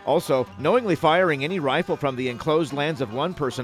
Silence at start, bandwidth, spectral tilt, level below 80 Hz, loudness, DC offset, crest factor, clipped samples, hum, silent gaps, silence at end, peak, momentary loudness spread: 0 s; 15.5 kHz; -6 dB/octave; -58 dBFS; -23 LUFS; under 0.1%; 16 dB; under 0.1%; none; none; 0 s; -6 dBFS; 6 LU